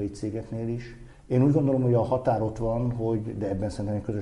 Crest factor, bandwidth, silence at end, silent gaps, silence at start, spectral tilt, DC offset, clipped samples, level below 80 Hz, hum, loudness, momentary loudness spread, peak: 16 dB; 11 kHz; 0 s; none; 0 s; -9 dB/octave; under 0.1%; under 0.1%; -46 dBFS; none; -27 LUFS; 10 LU; -10 dBFS